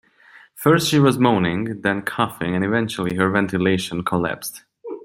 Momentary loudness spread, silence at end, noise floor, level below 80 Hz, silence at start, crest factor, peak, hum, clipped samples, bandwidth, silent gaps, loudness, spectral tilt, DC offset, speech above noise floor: 9 LU; 0.05 s; -50 dBFS; -54 dBFS; 0.55 s; 18 dB; -2 dBFS; none; under 0.1%; 16 kHz; none; -20 LUFS; -5.5 dB/octave; under 0.1%; 30 dB